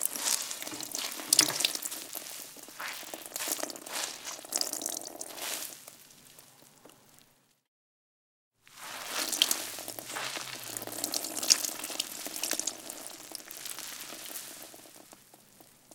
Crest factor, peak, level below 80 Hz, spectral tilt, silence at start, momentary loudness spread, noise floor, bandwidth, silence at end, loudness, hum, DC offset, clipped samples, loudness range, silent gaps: 36 dB; 0 dBFS; -80 dBFS; 1 dB/octave; 0 s; 19 LU; -66 dBFS; 19 kHz; 0 s; -32 LUFS; none; under 0.1%; under 0.1%; 12 LU; 7.68-8.51 s